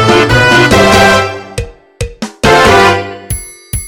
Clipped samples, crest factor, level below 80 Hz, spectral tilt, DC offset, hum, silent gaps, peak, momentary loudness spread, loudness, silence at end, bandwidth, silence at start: 2%; 8 dB; -26 dBFS; -4 dB/octave; under 0.1%; none; none; 0 dBFS; 17 LU; -7 LUFS; 0 s; 17.5 kHz; 0 s